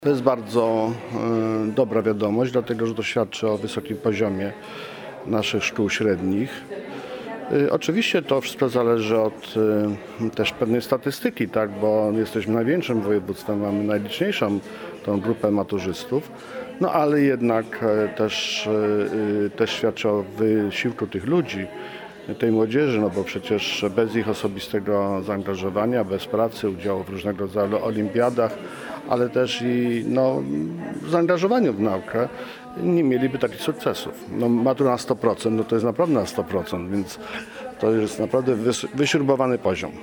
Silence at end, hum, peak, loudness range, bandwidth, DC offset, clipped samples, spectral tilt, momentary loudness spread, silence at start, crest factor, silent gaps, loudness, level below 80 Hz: 0 s; none; -2 dBFS; 2 LU; over 20 kHz; under 0.1%; under 0.1%; -6 dB/octave; 9 LU; 0 s; 20 dB; none; -23 LUFS; -60 dBFS